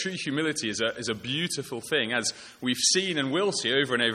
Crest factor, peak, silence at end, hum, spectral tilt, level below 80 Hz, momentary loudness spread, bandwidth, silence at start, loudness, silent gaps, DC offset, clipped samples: 18 dB; -10 dBFS; 0 s; none; -2.5 dB/octave; -68 dBFS; 8 LU; 15.5 kHz; 0 s; -26 LUFS; none; under 0.1%; under 0.1%